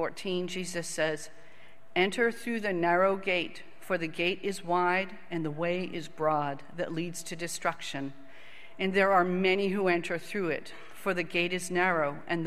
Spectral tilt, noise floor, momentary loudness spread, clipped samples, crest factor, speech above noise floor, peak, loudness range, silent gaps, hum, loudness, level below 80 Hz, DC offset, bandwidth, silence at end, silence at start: -4.5 dB/octave; -52 dBFS; 11 LU; under 0.1%; 20 dB; 22 dB; -10 dBFS; 5 LU; none; none; -30 LUFS; -70 dBFS; 0.8%; 15 kHz; 0 s; 0 s